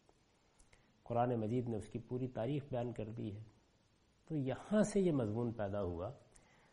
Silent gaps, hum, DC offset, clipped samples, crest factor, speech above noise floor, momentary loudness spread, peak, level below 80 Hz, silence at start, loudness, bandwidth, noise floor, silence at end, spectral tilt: none; none; under 0.1%; under 0.1%; 20 dB; 35 dB; 12 LU; -20 dBFS; -64 dBFS; 1.05 s; -39 LUFS; 11 kHz; -73 dBFS; 0.55 s; -7.5 dB/octave